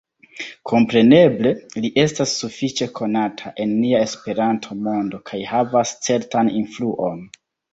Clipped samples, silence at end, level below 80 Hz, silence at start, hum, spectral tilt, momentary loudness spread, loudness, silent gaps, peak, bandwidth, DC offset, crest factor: under 0.1%; 0.45 s; -58 dBFS; 0.35 s; none; -5 dB/octave; 12 LU; -19 LUFS; none; -2 dBFS; 8 kHz; under 0.1%; 18 dB